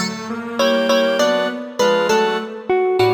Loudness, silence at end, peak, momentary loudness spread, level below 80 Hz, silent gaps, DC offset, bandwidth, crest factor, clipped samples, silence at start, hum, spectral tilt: -18 LUFS; 0 s; -4 dBFS; 8 LU; -60 dBFS; none; under 0.1%; 19.5 kHz; 14 dB; under 0.1%; 0 s; none; -4 dB/octave